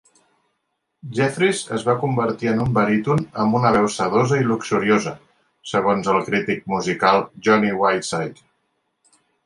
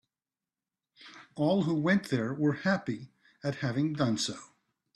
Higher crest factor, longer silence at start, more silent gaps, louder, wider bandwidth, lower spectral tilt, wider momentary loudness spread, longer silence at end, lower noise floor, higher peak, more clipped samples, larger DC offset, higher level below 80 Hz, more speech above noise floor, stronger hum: about the same, 18 dB vs 18 dB; about the same, 1.05 s vs 1 s; neither; first, -20 LUFS vs -30 LUFS; about the same, 11.5 kHz vs 12.5 kHz; about the same, -5.5 dB/octave vs -5.5 dB/octave; second, 6 LU vs 17 LU; first, 1.15 s vs 0.5 s; second, -74 dBFS vs under -90 dBFS; first, -2 dBFS vs -12 dBFS; neither; neither; first, -54 dBFS vs -70 dBFS; second, 55 dB vs over 61 dB; neither